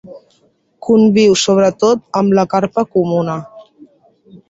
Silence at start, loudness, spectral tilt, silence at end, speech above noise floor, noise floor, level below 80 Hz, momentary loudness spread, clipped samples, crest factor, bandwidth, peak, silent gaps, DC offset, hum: 0.05 s; -13 LUFS; -5.5 dB/octave; 0.15 s; 45 dB; -57 dBFS; -56 dBFS; 9 LU; under 0.1%; 14 dB; 8 kHz; -2 dBFS; none; under 0.1%; none